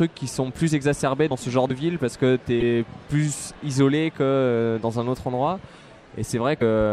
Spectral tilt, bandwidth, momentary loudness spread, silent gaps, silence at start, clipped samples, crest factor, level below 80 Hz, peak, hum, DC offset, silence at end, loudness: -6 dB/octave; 13.5 kHz; 7 LU; none; 0 s; under 0.1%; 16 dB; -48 dBFS; -6 dBFS; none; under 0.1%; 0 s; -23 LUFS